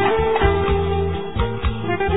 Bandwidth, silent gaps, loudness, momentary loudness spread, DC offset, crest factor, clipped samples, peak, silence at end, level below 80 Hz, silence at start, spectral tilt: 4 kHz; none; -20 LUFS; 6 LU; 2%; 16 dB; under 0.1%; -4 dBFS; 0 s; -26 dBFS; 0 s; -10.5 dB/octave